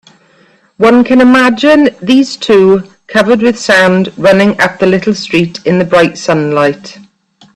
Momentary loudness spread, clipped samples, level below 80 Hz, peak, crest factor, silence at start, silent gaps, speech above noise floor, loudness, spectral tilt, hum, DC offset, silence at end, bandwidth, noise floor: 6 LU; 0.1%; -46 dBFS; 0 dBFS; 8 dB; 0.8 s; none; 39 dB; -8 LUFS; -5.5 dB/octave; none; under 0.1%; 0.65 s; 12.5 kHz; -47 dBFS